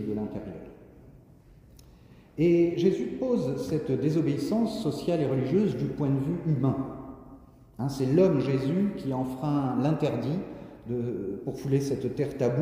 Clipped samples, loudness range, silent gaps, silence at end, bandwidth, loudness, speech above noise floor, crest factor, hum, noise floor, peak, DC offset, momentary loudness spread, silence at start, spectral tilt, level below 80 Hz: under 0.1%; 3 LU; none; 0 s; 16 kHz; -28 LUFS; 27 dB; 18 dB; none; -54 dBFS; -10 dBFS; under 0.1%; 13 LU; 0 s; -8 dB/octave; -56 dBFS